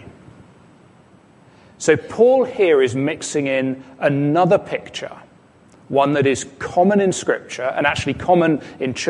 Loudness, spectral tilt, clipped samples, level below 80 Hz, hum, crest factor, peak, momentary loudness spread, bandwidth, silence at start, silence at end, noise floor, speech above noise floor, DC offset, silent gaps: -18 LUFS; -5.5 dB/octave; under 0.1%; -52 dBFS; none; 18 dB; -2 dBFS; 10 LU; 11.5 kHz; 0 s; 0 s; -49 dBFS; 32 dB; under 0.1%; none